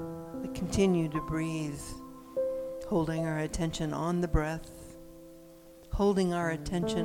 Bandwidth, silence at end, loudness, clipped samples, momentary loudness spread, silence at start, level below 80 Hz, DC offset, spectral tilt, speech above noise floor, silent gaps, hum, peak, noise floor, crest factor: 18 kHz; 0 s; -32 LUFS; under 0.1%; 20 LU; 0 s; -44 dBFS; under 0.1%; -6 dB/octave; 22 dB; none; none; -14 dBFS; -52 dBFS; 18 dB